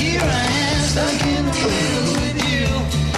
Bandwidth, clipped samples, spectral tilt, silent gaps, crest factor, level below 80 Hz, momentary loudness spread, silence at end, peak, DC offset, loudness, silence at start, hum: 14.5 kHz; under 0.1%; -4.5 dB/octave; none; 10 dB; -28 dBFS; 2 LU; 0 s; -8 dBFS; under 0.1%; -18 LUFS; 0 s; none